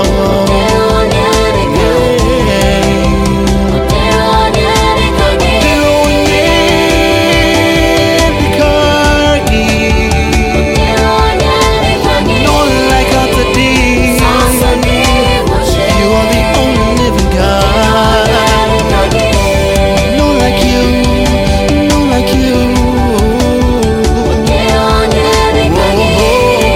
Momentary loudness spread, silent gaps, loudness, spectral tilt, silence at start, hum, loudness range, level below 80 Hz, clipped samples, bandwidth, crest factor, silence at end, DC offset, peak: 2 LU; none; -9 LUFS; -5 dB/octave; 0 s; none; 2 LU; -16 dBFS; under 0.1%; 16.5 kHz; 8 dB; 0 s; under 0.1%; 0 dBFS